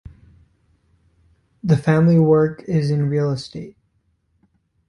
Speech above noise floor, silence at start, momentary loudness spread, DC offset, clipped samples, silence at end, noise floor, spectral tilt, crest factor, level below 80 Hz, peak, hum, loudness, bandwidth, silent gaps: 49 dB; 1.65 s; 18 LU; under 0.1%; under 0.1%; 1.2 s; -66 dBFS; -8.5 dB/octave; 18 dB; -52 dBFS; -2 dBFS; none; -18 LUFS; 10.5 kHz; none